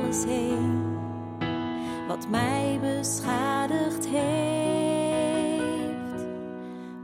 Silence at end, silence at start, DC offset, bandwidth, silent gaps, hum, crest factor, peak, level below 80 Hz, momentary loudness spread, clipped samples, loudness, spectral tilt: 0 s; 0 s; under 0.1%; 16 kHz; none; none; 14 dB; -12 dBFS; -56 dBFS; 9 LU; under 0.1%; -28 LUFS; -5 dB/octave